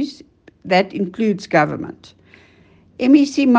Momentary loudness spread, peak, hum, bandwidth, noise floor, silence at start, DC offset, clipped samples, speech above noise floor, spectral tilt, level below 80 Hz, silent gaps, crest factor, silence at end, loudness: 16 LU; 0 dBFS; none; 8.4 kHz; -51 dBFS; 0 s; under 0.1%; under 0.1%; 34 dB; -6 dB/octave; -60 dBFS; none; 18 dB; 0 s; -17 LUFS